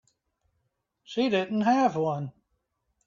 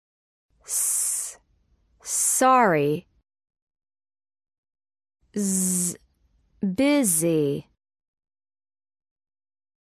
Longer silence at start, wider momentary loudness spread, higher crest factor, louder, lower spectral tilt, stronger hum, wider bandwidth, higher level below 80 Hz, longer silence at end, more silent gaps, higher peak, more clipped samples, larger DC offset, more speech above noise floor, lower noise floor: first, 1.1 s vs 0.7 s; second, 12 LU vs 15 LU; about the same, 18 dB vs 20 dB; second, -26 LUFS vs -22 LUFS; first, -6.5 dB/octave vs -4 dB/octave; neither; second, 7.4 kHz vs 16 kHz; second, -72 dBFS vs -66 dBFS; second, 0.75 s vs 2.25 s; second, none vs 3.62-3.67 s, 4.58-4.63 s; second, -12 dBFS vs -8 dBFS; neither; neither; first, 52 dB vs 44 dB; first, -78 dBFS vs -65 dBFS